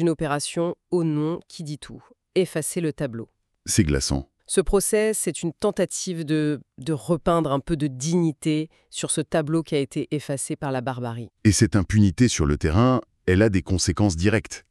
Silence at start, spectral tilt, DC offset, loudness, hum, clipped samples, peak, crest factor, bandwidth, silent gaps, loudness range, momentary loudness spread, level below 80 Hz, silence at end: 0 s; -5.5 dB/octave; under 0.1%; -23 LUFS; none; under 0.1%; -4 dBFS; 18 dB; 13.5 kHz; none; 5 LU; 11 LU; -40 dBFS; 0.1 s